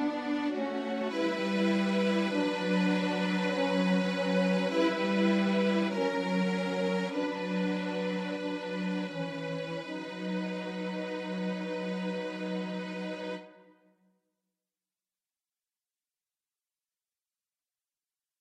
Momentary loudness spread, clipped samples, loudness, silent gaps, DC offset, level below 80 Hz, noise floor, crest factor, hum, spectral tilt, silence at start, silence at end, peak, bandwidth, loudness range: 8 LU; under 0.1%; -31 LUFS; none; under 0.1%; -74 dBFS; under -90 dBFS; 16 dB; none; -6.5 dB/octave; 0 s; 4.9 s; -16 dBFS; 10 kHz; 10 LU